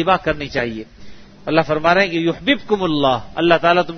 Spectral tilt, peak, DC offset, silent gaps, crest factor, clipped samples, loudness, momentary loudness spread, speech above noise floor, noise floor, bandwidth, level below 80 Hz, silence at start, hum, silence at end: -6 dB/octave; 0 dBFS; under 0.1%; none; 18 dB; under 0.1%; -17 LUFS; 8 LU; 20 dB; -37 dBFS; 6.6 kHz; -44 dBFS; 0 s; none; 0 s